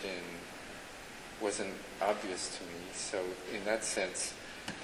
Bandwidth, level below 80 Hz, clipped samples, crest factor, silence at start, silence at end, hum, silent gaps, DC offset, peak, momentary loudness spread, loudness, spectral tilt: 20 kHz; -64 dBFS; under 0.1%; 20 dB; 0 s; 0 s; none; none; under 0.1%; -18 dBFS; 12 LU; -38 LUFS; -2 dB/octave